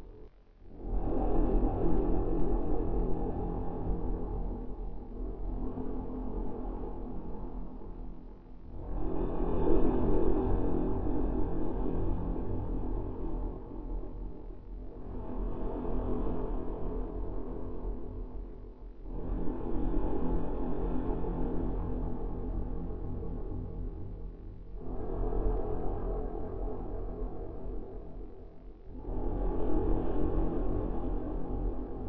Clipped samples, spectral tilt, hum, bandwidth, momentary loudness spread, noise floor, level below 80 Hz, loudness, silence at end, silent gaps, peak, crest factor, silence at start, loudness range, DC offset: under 0.1%; -12 dB/octave; none; 3.5 kHz; 15 LU; -52 dBFS; -36 dBFS; -37 LUFS; 0 s; none; -14 dBFS; 18 dB; 0 s; 8 LU; under 0.1%